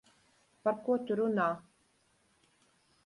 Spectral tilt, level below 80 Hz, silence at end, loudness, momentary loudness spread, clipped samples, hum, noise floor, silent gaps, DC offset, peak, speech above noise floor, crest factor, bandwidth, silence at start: -7.5 dB/octave; -80 dBFS; 1.45 s; -33 LUFS; 5 LU; under 0.1%; none; -72 dBFS; none; under 0.1%; -18 dBFS; 40 dB; 18 dB; 11.5 kHz; 0.65 s